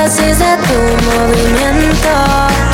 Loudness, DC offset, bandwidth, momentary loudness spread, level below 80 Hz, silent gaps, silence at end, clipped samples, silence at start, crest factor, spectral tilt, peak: -10 LUFS; under 0.1%; 17 kHz; 1 LU; -18 dBFS; none; 0 s; under 0.1%; 0 s; 10 dB; -4.5 dB/octave; 0 dBFS